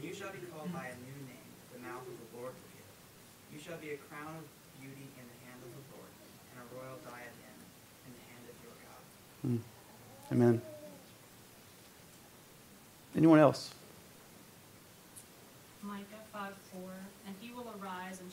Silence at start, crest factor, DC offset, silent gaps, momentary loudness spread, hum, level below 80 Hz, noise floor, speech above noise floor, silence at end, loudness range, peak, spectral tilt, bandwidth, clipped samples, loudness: 0 s; 28 dB; under 0.1%; none; 26 LU; none; -76 dBFS; -58 dBFS; 24 dB; 0 s; 18 LU; -10 dBFS; -6.5 dB/octave; 16 kHz; under 0.1%; -35 LUFS